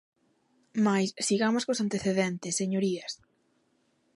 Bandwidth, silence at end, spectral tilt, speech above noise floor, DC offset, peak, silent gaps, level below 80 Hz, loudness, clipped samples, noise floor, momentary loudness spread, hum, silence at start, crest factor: 11.5 kHz; 1 s; -4.5 dB/octave; 43 dB; under 0.1%; -12 dBFS; none; -70 dBFS; -28 LUFS; under 0.1%; -71 dBFS; 10 LU; none; 0.75 s; 18 dB